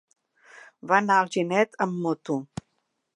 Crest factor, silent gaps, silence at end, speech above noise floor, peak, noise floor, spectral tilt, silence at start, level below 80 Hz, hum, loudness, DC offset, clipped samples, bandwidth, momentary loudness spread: 22 dB; none; 0.7 s; 52 dB; -4 dBFS; -76 dBFS; -5.5 dB/octave; 0.55 s; -66 dBFS; none; -24 LUFS; under 0.1%; under 0.1%; 11 kHz; 20 LU